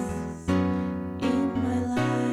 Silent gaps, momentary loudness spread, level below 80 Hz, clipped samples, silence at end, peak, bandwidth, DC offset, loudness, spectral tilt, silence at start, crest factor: none; 6 LU; -48 dBFS; under 0.1%; 0 s; -14 dBFS; 13 kHz; under 0.1%; -27 LUFS; -7 dB/octave; 0 s; 12 dB